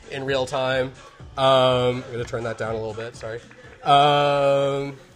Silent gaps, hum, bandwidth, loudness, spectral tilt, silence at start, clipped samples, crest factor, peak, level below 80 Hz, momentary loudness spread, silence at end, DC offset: none; none; 11.5 kHz; -21 LUFS; -5 dB/octave; 0.05 s; under 0.1%; 18 dB; -4 dBFS; -50 dBFS; 16 LU; 0.15 s; under 0.1%